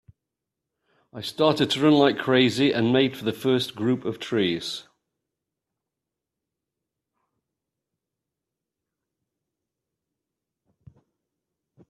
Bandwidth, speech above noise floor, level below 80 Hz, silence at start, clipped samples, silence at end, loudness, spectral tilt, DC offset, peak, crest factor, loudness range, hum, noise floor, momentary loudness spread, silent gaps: 13.5 kHz; 64 dB; -68 dBFS; 1.15 s; under 0.1%; 7.1 s; -22 LUFS; -5.5 dB/octave; under 0.1%; -6 dBFS; 22 dB; 11 LU; none; -86 dBFS; 11 LU; none